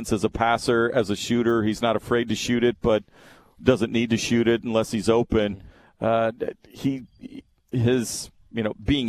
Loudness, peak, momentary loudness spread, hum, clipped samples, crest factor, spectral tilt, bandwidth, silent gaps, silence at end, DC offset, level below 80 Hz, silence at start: -24 LUFS; -2 dBFS; 11 LU; none; under 0.1%; 20 dB; -5.5 dB/octave; 14 kHz; none; 0 s; under 0.1%; -46 dBFS; 0 s